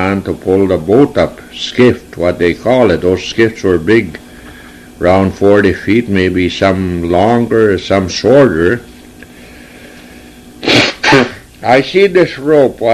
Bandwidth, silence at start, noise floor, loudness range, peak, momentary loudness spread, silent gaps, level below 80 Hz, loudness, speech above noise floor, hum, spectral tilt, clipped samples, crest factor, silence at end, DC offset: 14 kHz; 0 s; -35 dBFS; 2 LU; 0 dBFS; 7 LU; none; -38 dBFS; -11 LUFS; 24 dB; none; -6 dB/octave; 0.3%; 12 dB; 0 s; under 0.1%